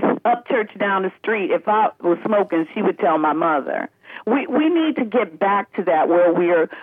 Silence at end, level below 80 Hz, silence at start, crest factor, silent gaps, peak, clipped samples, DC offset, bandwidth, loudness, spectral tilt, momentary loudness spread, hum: 0 s; -78 dBFS; 0 s; 12 dB; none; -6 dBFS; under 0.1%; under 0.1%; 3.8 kHz; -19 LUFS; -8.5 dB/octave; 6 LU; none